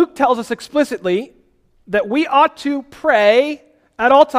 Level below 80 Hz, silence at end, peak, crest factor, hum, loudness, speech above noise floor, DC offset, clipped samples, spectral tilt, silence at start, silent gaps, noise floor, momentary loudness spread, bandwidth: -56 dBFS; 0 s; 0 dBFS; 16 dB; none; -16 LUFS; 40 dB; under 0.1%; under 0.1%; -4.5 dB/octave; 0 s; none; -55 dBFS; 11 LU; 15 kHz